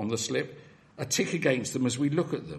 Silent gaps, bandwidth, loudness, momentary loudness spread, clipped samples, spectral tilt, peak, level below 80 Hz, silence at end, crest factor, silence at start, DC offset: none; 13 kHz; -28 LUFS; 7 LU; under 0.1%; -4.5 dB/octave; -10 dBFS; -66 dBFS; 0 s; 20 dB; 0 s; under 0.1%